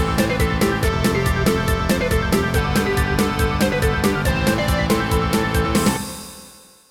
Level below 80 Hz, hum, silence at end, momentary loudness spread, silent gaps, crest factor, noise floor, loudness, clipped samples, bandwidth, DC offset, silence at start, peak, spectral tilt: -28 dBFS; none; 0.4 s; 1 LU; none; 14 dB; -45 dBFS; -19 LUFS; under 0.1%; 18.5 kHz; 0.1%; 0 s; -4 dBFS; -5 dB/octave